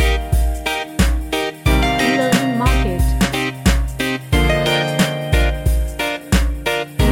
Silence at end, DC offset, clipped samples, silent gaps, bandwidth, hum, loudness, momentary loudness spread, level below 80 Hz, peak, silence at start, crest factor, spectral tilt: 0 s; under 0.1%; under 0.1%; none; 17 kHz; none; -18 LUFS; 5 LU; -20 dBFS; 0 dBFS; 0 s; 16 dB; -5 dB/octave